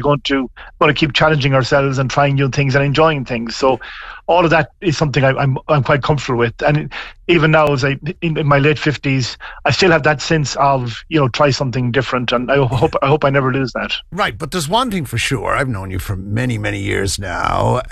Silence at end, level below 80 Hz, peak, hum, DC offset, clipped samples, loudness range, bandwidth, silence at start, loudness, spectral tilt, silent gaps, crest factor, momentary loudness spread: 0 s; -36 dBFS; -2 dBFS; none; under 0.1%; under 0.1%; 4 LU; 13 kHz; 0 s; -16 LUFS; -5.5 dB/octave; none; 14 dB; 8 LU